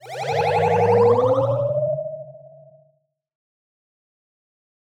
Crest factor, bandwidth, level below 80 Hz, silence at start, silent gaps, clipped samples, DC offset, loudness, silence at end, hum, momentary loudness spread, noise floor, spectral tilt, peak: 16 dB; 10.5 kHz; -60 dBFS; 0.05 s; none; under 0.1%; under 0.1%; -19 LUFS; 2.35 s; none; 12 LU; -65 dBFS; -7 dB/octave; -6 dBFS